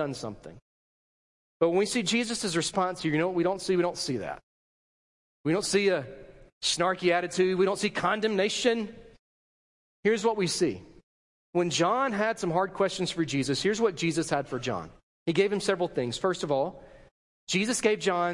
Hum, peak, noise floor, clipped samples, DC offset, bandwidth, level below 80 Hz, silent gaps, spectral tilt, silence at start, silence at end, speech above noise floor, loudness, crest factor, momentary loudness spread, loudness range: none; -10 dBFS; under -90 dBFS; under 0.1%; under 0.1%; 11.5 kHz; -62 dBFS; 0.62-1.60 s, 4.43-5.44 s, 6.53-6.61 s, 9.19-10.03 s, 11.03-11.53 s, 15.03-15.26 s, 17.11-17.47 s; -4 dB/octave; 0 s; 0 s; over 63 dB; -28 LUFS; 20 dB; 9 LU; 3 LU